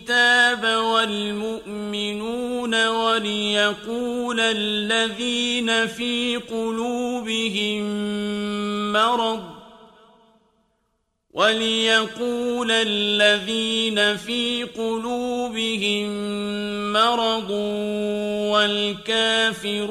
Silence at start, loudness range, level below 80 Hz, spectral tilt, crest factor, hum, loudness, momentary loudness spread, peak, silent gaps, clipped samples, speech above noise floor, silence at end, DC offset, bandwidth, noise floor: 0 s; 4 LU; -58 dBFS; -3 dB/octave; 18 dB; none; -21 LUFS; 9 LU; -4 dBFS; none; under 0.1%; 50 dB; 0 s; under 0.1%; 14.5 kHz; -72 dBFS